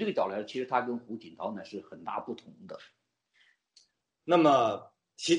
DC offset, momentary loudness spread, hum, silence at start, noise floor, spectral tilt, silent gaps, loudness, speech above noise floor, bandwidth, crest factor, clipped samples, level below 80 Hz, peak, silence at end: under 0.1%; 22 LU; none; 0 s; -70 dBFS; -4.5 dB/octave; none; -30 LUFS; 39 dB; 10.5 kHz; 20 dB; under 0.1%; -80 dBFS; -12 dBFS; 0 s